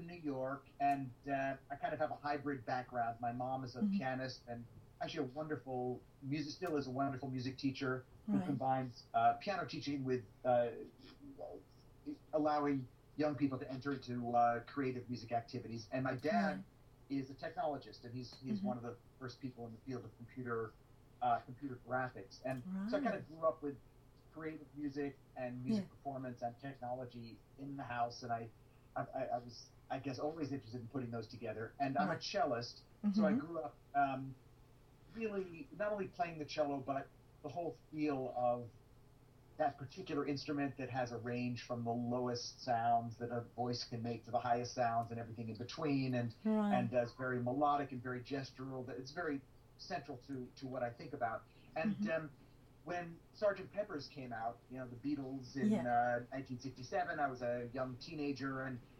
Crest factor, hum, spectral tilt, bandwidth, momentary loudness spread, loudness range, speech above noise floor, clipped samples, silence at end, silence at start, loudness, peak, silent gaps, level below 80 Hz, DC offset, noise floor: 20 dB; none; -6.5 dB/octave; 14.5 kHz; 13 LU; 6 LU; 23 dB; under 0.1%; 0.05 s; 0 s; -41 LUFS; -22 dBFS; none; -70 dBFS; under 0.1%; -64 dBFS